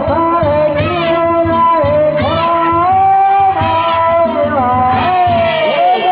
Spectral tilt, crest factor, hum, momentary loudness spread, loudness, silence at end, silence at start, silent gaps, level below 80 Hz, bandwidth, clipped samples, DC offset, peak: -9.5 dB/octave; 8 dB; none; 3 LU; -11 LUFS; 0 s; 0 s; none; -34 dBFS; 4 kHz; under 0.1%; under 0.1%; -2 dBFS